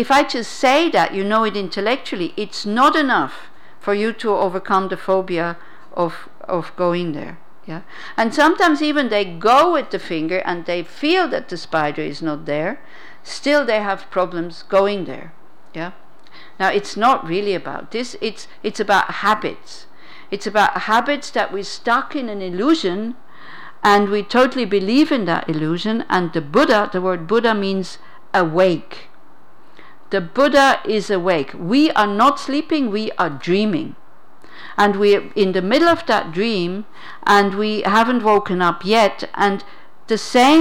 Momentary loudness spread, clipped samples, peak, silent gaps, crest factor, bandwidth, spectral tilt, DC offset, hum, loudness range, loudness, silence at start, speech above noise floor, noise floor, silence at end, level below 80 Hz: 13 LU; under 0.1%; -6 dBFS; none; 12 dB; 18 kHz; -5 dB/octave; 2%; none; 5 LU; -18 LUFS; 0 s; 33 dB; -50 dBFS; 0 s; -56 dBFS